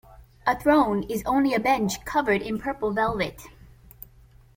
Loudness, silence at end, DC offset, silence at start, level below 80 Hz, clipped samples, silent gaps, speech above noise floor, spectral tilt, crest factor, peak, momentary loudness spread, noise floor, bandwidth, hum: -24 LUFS; 1.05 s; under 0.1%; 0.1 s; -48 dBFS; under 0.1%; none; 29 dB; -5 dB/octave; 18 dB; -8 dBFS; 8 LU; -53 dBFS; 16.5 kHz; none